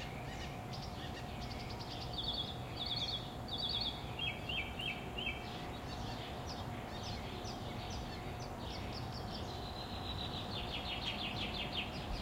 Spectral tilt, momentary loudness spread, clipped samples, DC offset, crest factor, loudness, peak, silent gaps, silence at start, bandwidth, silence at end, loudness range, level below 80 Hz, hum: -4.5 dB/octave; 7 LU; under 0.1%; under 0.1%; 16 dB; -41 LUFS; -26 dBFS; none; 0 s; 16 kHz; 0 s; 5 LU; -52 dBFS; none